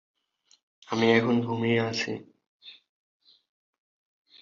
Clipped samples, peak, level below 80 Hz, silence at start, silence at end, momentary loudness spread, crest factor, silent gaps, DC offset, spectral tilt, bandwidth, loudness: under 0.1%; -8 dBFS; -68 dBFS; 0.9 s; 1.7 s; 11 LU; 22 dB; 2.47-2.60 s; under 0.1%; -5.5 dB/octave; 7.4 kHz; -26 LUFS